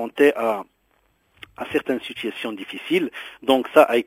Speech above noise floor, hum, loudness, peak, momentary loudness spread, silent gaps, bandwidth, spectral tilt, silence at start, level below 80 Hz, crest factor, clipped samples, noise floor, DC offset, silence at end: 44 dB; none; -22 LUFS; 0 dBFS; 14 LU; none; 16 kHz; -4.5 dB/octave; 0 s; -64 dBFS; 22 dB; under 0.1%; -65 dBFS; under 0.1%; 0.05 s